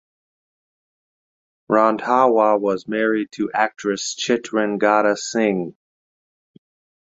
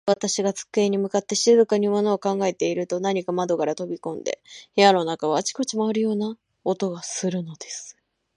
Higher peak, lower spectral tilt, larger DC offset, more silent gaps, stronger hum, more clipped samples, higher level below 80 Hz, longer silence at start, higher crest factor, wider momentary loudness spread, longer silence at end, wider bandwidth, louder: about the same, -2 dBFS vs -2 dBFS; about the same, -4 dB/octave vs -4 dB/octave; neither; neither; neither; neither; first, -66 dBFS vs -74 dBFS; first, 1.7 s vs 0.05 s; about the same, 20 dB vs 20 dB; second, 7 LU vs 14 LU; first, 1.3 s vs 0.45 s; second, 8 kHz vs 11.5 kHz; first, -19 LUFS vs -23 LUFS